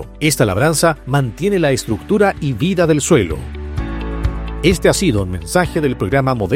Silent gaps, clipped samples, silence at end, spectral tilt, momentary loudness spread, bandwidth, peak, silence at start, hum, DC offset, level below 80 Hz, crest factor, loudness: none; under 0.1%; 0 s; -5 dB/octave; 9 LU; 16.5 kHz; 0 dBFS; 0 s; none; under 0.1%; -28 dBFS; 16 dB; -16 LUFS